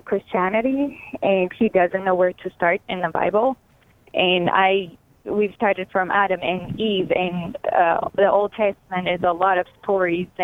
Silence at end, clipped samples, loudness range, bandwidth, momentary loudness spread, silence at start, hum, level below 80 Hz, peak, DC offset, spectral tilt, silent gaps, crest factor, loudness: 0 s; under 0.1%; 1 LU; 4 kHz; 7 LU; 0.05 s; none; -56 dBFS; -4 dBFS; under 0.1%; -7.5 dB/octave; none; 18 dB; -21 LUFS